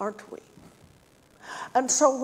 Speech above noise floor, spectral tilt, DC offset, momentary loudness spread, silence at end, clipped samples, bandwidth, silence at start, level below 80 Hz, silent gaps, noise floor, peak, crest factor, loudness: 33 dB; -2 dB/octave; under 0.1%; 24 LU; 0 s; under 0.1%; 16 kHz; 0 s; -70 dBFS; none; -58 dBFS; -8 dBFS; 22 dB; -24 LUFS